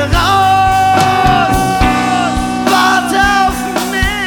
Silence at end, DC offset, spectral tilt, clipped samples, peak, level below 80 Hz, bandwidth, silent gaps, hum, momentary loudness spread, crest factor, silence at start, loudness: 0 s; under 0.1%; -4 dB/octave; under 0.1%; 0 dBFS; -24 dBFS; 19.5 kHz; none; none; 5 LU; 10 dB; 0 s; -11 LUFS